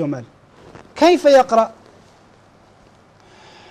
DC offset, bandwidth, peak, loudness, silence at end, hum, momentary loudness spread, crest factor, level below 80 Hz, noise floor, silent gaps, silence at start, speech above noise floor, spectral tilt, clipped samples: under 0.1%; 13.5 kHz; -4 dBFS; -14 LUFS; 2 s; none; 18 LU; 16 dB; -56 dBFS; -50 dBFS; none; 0 s; 36 dB; -5 dB/octave; under 0.1%